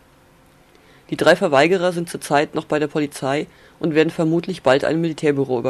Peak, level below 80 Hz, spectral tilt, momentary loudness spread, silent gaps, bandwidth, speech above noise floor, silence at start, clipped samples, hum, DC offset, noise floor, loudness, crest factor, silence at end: -2 dBFS; -58 dBFS; -5.5 dB/octave; 9 LU; none; 13.5 kHz; 33 dB; 1.1 s; under 0.1%; none; under 0.1%; -52 dBFS; -19 LUFS; 16 dB; 0 s